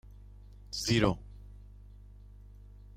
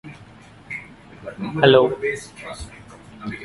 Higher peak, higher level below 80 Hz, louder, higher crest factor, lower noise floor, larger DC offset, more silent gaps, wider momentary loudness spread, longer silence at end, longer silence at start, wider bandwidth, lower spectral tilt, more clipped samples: second, -14 dBFS vs 0 dBFS; about the same, -50 dBFS vs -50 dBFS; second, -31 LUFS vs -18 LUFS; about the same, 24 dB vs 22 dB; first, -51 dBFS vs -45 dBFS; neither; neither; first, 27 LU vs 24 LU; first, 1.4 s vs 0 s; first, 0.7 s vs 0.05 s; first, 16 kHz vs 11.5 kHz; about the same, -5 dB/octave vs -5.5 dB/octave; neither